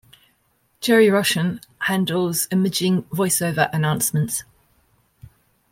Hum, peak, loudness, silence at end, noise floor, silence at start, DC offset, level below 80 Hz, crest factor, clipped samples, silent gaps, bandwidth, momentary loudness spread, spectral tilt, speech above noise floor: none; -4 dBFS; -20 LUFS; 1.3 s; -65 dBFS; 0.8 s; under 0.1%; -58 dBFS; 16 dB; under 0.1%; none; 16.5 kHz; 10 LU; -4.5 dB/octave; 45 dB